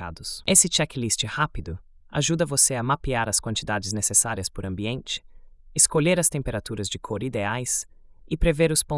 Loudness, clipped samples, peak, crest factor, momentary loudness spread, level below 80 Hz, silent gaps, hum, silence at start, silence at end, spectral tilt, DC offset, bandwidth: -23 LUFS; under 0.1%; -4 dBFS; 20 dB; 13 LU; -40 dBFS; none; none; 0 s; 0 s; -3 dB/octave; under 0.1%; 12 kHz